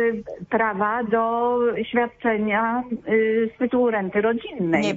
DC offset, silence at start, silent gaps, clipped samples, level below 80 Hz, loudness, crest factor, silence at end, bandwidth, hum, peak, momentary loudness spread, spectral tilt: under 0.1%; 0 s; none; under 0.1%; -58 dBFS; -22 LUFS; 14 dB; 0 s; 8 kHz; none; -6 dBFS; 4 LU; -6.5 dB/octave